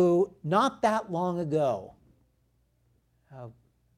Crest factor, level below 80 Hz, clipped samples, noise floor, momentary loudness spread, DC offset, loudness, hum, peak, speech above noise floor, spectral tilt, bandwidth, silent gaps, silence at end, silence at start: 18 dB; -68 dBFS; under 0.1%; -70 dBFS; 22 LU; under 0.1%; -28 LUFS; none; -12 dBFS; 43 dB; -6.5 dB/octave; 12.5 kHz; none; 0.45 s; 0 s